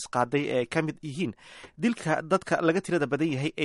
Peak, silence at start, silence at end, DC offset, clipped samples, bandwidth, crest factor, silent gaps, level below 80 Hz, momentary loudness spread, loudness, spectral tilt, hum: -10 dBFS; 0 s; 0 s; under 0.1%; under 0.1%; 11.5 kHz; 18 dB; none; -64 dBFS; 8 LU; -28 LUFS; -6 dB/octave; none